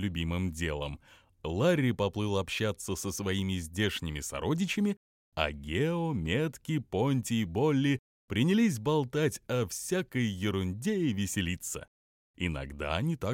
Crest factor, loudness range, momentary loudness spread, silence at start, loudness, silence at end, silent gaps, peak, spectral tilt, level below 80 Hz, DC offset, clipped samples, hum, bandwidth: 20 dB; 3 LU; 8 LU; 0 s; -31 LUFS; 0 s; 4.97-5.32 s, 7.99-8.28 s, 11.88-12.34 s; -12 dBFS; -5.5 dB/octave; -50 dBFS; under 0.1%; under 0.1%; none; 16.5 kHz